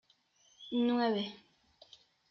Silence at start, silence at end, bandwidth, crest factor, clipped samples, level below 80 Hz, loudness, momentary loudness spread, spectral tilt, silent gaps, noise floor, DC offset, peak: 0.6 s; 0.95 s; 6.6 kHz; 16 dB; under 0.1%; -80 dBFS; -33 LUFS; 14 LU; -3.5 dB/octave; none; -70 dBFS; under 0.1%; -22 dBFS